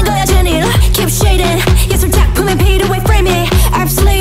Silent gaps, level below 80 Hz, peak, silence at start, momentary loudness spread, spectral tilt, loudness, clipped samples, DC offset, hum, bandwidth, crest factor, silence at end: none; -12 dBFS; 0 dBFS; 0 s; 1 LU; -4.5 dB/octave; -11 LUFS; under 0.1%; under 0.1%; none; 16.5 kHz; 10 dB; 0 s